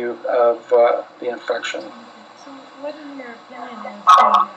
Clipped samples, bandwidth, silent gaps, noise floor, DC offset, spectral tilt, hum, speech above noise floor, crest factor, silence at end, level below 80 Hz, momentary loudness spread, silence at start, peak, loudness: under 0.1%; 10.5 kHz; none; -40 dBFS; under 0.1%; -3 dB/octave; none; 22 dB; 18 dB; 0.05 s; -78 dBFS; 23 LU; 0 s; 0 dBFS; -16 LUFS